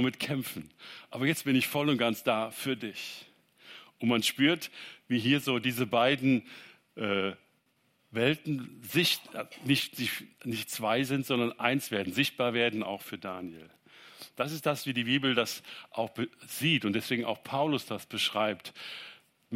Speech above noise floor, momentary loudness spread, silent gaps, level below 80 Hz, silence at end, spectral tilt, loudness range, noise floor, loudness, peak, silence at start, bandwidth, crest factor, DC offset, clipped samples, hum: 41 dB; 15 LU; none; -74 dBFS; 0 s; -4.5 dB/octave; 3 LU; -72 dBFS; -30 LUFS; -10 dBFS; 0 s; 16 kHz; 22 dB; under 0.1%; under 0.1%; none